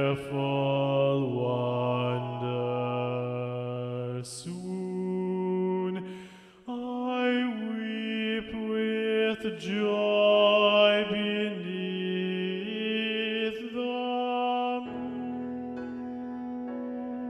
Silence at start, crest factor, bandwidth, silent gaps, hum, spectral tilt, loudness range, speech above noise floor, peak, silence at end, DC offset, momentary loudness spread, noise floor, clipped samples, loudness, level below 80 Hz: 0 s; 18 dB; 12 kHz; none; none; -6 dB/octave; 8 LU; 21 dB; -12 dBFS; 0 s; under 0.1%; 13 LU; -49 dBFS; under 0.1%; -29 LUFS; -68 dBFS